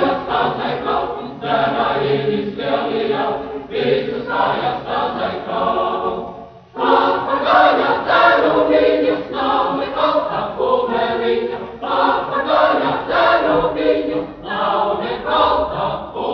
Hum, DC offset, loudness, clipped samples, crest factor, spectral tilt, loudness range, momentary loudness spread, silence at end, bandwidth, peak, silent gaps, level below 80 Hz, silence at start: none; under 0.1%; -17 LUFS; under 0.1%; 16 dB; -2.5 dB/octave; 5 LU; 9 LU; 0 s; 6.2 kHz; 0 dBFS; none; -46 dBFS; 0 s